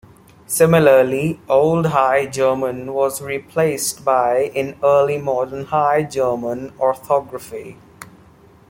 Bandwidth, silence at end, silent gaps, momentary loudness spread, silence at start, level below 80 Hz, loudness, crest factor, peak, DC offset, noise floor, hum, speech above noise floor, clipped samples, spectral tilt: 17 kHz; 0.65 s; none; 10 LU; 0.5 s; -54 dBFS; -17 LUFS; 16 dB; -2 dBFS; under 0.1%; -47 dBFS; none; 30 dB; under 0.1%; -5 dB/octave